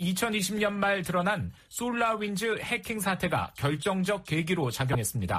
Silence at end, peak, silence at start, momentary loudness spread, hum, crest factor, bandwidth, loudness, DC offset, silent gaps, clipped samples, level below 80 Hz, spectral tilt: 0 s; -14 dBFS; 0 s; 3 LU; none; 16 dB; 15.5 kHz; -29 LUFS; under 0.1%; none; under 0.1%; -54 dBFS; -4.5 dB/octave